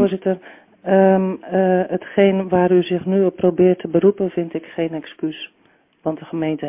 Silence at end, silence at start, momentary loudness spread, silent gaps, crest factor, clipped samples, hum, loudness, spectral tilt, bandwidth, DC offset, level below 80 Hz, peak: 0 s; 0 s; 12 LU; none; 16 dB; under 0.1%; none; -18 LUFS; -11.5 dB/octave; 3.7 kHz; under 0.1%; -58 dBFS; -2 dBFS